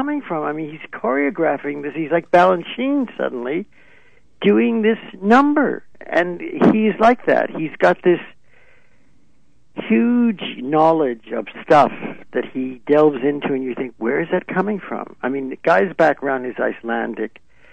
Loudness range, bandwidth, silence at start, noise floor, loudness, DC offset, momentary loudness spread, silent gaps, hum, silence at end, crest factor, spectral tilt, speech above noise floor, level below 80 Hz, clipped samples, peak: 4 LU; 8.8 kHz; 0 s; -60 dBFS; -18 LUFS; 0.5%; 12 LU; none; none; 0.45 s; 16 dB; -7.5 dB/octave; 42 dB; -58 dBFS; under 0.1%; -2 dBFS